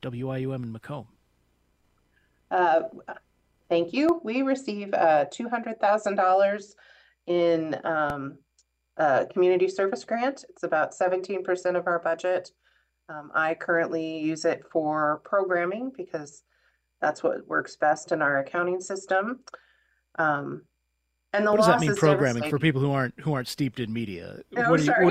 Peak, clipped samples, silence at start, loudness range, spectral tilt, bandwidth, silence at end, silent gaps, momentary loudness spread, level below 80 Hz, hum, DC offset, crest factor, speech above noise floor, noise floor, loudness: -6 dBFS; under 0.1%; 0.05 s; 4 LU; -6 dB/octave; 15 kHz; 0 s; none; 15 LU; -66 dBFS; none; under 0.1%; 20 dB; 51 dB; -77 dBFS; -26 LUFS